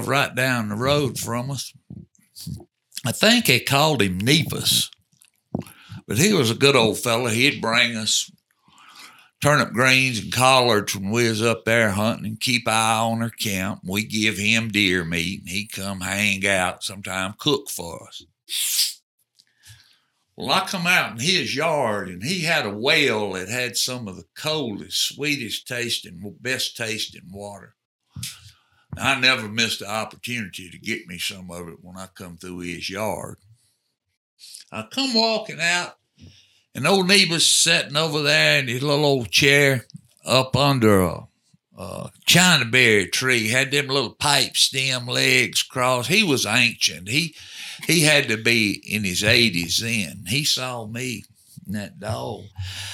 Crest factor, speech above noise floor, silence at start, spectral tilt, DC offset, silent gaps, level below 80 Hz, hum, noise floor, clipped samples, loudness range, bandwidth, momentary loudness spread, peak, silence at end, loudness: 22 dB; 42 dB; 0 s; -3 dB/octave; under 0.1%; 19.03-19.18 s, 27.85-27.99 s, 34.17-34.37 s; -58 dBFS; none; -63 dBFS; under 0.1%; 8 LU; 18 kHz; 18 LU; 0 dBFS; 0 s; -20 LUFS